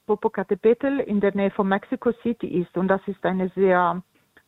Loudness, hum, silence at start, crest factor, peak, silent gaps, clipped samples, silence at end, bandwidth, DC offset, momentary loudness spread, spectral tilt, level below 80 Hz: -23 LUFS; none; 0.1 s; 16 dB; -6 dBFS; none; under 0.1%; 0.45 s; 4.1 kHz; under 0.1%; 6 LU; -9.5 dB/octave; -58 dBFS